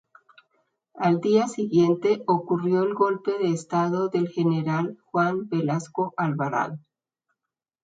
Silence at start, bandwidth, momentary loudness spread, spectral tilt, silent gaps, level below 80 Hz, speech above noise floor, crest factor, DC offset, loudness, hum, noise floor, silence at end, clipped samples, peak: 0.95 s; 9.2 kHz; 6 LU; -7.5 dB/octave; none; -72 dBFS; 64 dB; 18 dB; under 0.1%; -24 LUFS; none; -87 dBFS; 1.05 s; under 0.1%; -8 dBFS